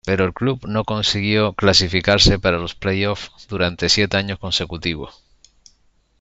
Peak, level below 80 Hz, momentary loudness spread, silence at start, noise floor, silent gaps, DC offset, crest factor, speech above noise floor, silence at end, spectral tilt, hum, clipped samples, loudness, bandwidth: -2 dBFS; -36 dBFS; 11 LU; 0.05 s; -59 dBFS; none; under 0.1%; 18 dB; 40 dB; 1.1 s; -4 dB/octave; none; under 0.1%; -18 LUFS; 8.2 kHz